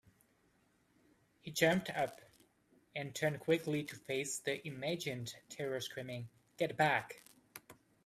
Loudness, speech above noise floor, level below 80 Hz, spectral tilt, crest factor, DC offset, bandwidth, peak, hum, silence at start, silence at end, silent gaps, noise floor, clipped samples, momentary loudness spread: -38 LUFS; 36 dB; -76 dBFS; -4 dB/octave; 24 dB; under 0.1%; 15.5 kHz; -16 dBFS; none; 1.45 s; 0.35 s; none; -74 dBFS; under 0.1%; 21 LU